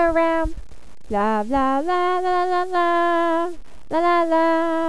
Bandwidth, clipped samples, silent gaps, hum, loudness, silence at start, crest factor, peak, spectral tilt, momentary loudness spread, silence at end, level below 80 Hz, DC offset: 11 kHz; under 0.1%; none; none; -20 LUFS; 0 s; 12 dB; -8 dBFS; -5.5 dB/octave; 6 LU; 0 s; -40 dBFS; 3%